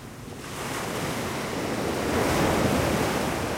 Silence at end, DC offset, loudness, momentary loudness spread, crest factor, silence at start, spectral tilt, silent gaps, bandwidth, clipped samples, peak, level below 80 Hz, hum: 0 s; under 0.1%; -26 LUFS; 11 LU; 16 dB; 0 s; -4.5 dB/octave; none; 16 kHz; under 0.1%; -10 dBFS; -42 dBFS; none